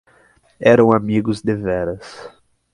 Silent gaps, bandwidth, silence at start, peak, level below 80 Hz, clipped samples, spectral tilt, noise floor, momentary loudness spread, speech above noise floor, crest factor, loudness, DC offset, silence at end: none; 11 kHz; 0.6 s; 0 dBFS; -48 dBFS; under 0.1%; -7.5 dB/octave; -54 dBFS; 20 LU; 38 dB; 18 dB; -17 LUFS; under 0.1%; 0.45 s